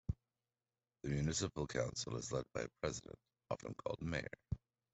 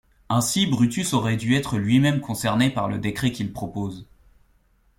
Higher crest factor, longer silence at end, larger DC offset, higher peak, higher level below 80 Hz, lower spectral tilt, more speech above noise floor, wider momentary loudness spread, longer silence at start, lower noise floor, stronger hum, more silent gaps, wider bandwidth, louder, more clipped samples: about the same, 20 dB vs 18 dB; second, 0.35 s vs 0.95 s; neither; second, -24 dBFS vs -6 dBFS; second, -60 dBFS vs -50 dBFS; about the same, -4.5 dB/octave vs -5 dB/octave; first, over 48 dB vs 39 dB; about the same, 11 LU vs 10 LU; second, 0.1 s vs 0.3 s; first, under -90 dBFS vs -61 dBFS; neither; neither; second, 8.2 kHz vs 16.5 kHz; second, -43 LUFS vs -23 LUFS; neither